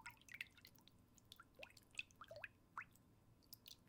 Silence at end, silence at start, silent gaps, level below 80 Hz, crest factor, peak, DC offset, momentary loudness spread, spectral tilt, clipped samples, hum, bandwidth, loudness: 0 s; 0 s; none; -80 dBFS; 28 dB; -32 dBFS; under 0.1%; 12 LU; -2 dB/octave; under 0.1%; none; 18 kHz; -57 LUFS